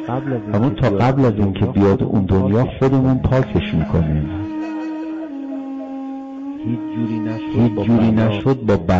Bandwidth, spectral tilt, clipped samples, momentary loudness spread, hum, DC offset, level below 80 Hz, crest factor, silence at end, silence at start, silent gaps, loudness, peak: 7.4 kHz; -9.5 dB/octave; under 0.1%; 12 LU; none; under 0.1%; -36 dBFS; 8 dB; 0 s; 0 s; none; -18 LUFS; -8 dBFS